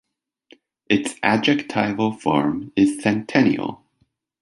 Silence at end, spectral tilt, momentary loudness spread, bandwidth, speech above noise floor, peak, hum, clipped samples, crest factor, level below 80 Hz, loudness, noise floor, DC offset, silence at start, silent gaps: 0.65 s; -5.5 dB/octave; 5 LU; 11.5 kHz; 47 dB; 0 dBFS; none; under 0.1%; 22 dB; -58 dBFS; -20 LUFS; -67 dBFS; under 0.1%; 0.9 s; none